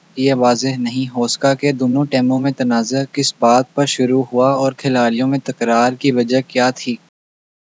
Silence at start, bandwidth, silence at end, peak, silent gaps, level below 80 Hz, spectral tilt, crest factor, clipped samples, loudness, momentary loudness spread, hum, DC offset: 0.15 s; 8 kHz; 0.75 s; 0 dBFS; none; -74 dBFS; -5 dB/octave; 16 dB; under 0.1%; -16 LUFS; 5 LU; none; under 0.1%